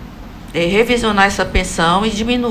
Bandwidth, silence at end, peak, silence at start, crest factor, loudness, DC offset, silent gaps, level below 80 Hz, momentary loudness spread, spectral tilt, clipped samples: 16 kHz; 0 s; 0 dBFS; 0 s; 16 dB; -15 LUFS; under 0.1%; none; -28 dBFS; 11 LU; -4 dB/octave; under 0.1%